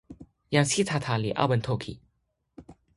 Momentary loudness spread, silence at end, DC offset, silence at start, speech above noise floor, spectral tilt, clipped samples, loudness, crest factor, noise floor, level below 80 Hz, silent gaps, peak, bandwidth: 8 LU; 0.25 s; under 0.1%; 0.1 s; 49 dB; -4.5 dB/octave; under 0.1%; -26 LUFS; 22 dB; -75 dBFS; -56 dBFS; none; -6 dBFS; 11.5 kHz